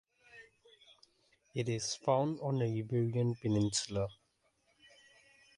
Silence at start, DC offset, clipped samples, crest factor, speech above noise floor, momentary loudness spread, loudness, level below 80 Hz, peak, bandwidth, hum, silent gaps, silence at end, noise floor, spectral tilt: 0.35 s; under 0.1%; under 0.1%; 20 dB; 42 dB; 12 LU; -35 LUFS; -64 dBFS; -16 dBFS; 11.5 kHz; none; none; 1.45 s; -76 dBFS; -5.5 dB/octave